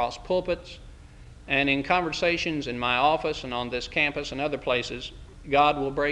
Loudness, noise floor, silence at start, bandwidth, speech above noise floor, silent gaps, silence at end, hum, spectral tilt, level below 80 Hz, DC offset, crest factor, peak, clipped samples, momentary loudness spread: -25 LUFS; -47 dBFS; 0 s; 10.5 kHz; 21 dB; none; 0 s; none; -4.5 dB/octave; -46 dBFS; under 0.1%; 20 dB; -6 dBFS; under 0.1%; 12 LU